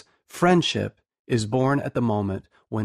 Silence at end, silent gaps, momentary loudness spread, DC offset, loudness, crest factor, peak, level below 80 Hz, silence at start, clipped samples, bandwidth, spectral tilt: 0 s; 1.19-1.25 s; 14 LU; under 0.1%; -24 LUFS; 16 dB; -8 dBFS; -56 dBFS; 0.35 s; under 0.1%; 14 kHz; -6 dB/octave